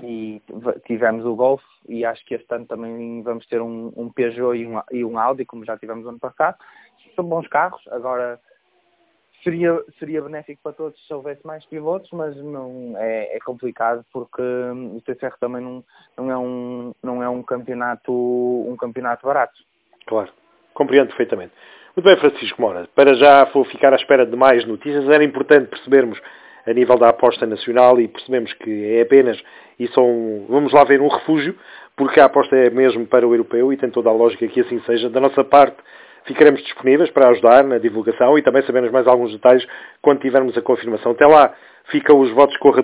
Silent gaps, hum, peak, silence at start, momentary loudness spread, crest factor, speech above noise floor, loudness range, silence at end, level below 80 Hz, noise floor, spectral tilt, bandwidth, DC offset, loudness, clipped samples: none; none; 0 dBFS; 0 s; 18 LU; 16 dB; 46 dB; 13 LU; 0 s; -62 dBFS; -62 dBFS; -9 dB/octave; 4 kHz; under 0.1%; -16 LUFS; under 0.1%